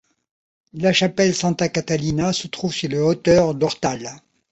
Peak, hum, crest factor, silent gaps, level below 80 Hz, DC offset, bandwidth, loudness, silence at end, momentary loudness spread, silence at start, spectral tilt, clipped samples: -4 dBFS; none; 18 dB; none; -50 dBFS; under 0.1%; 8.2 kHz; -20 LUFS; 0.35 s; 9 LU; 0.75 s; -5 dB/octave; under 0.1%